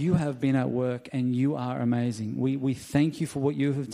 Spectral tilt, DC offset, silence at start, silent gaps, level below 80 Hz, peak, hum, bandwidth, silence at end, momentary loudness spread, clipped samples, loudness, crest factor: -7.5 dB/octave; under 0.1%; 0 s; none; -58 dBFS; -10 dBFS; none; 13 kHz; 0 s; 4 LU; under 0.1%; -27 LUFS; 16 dB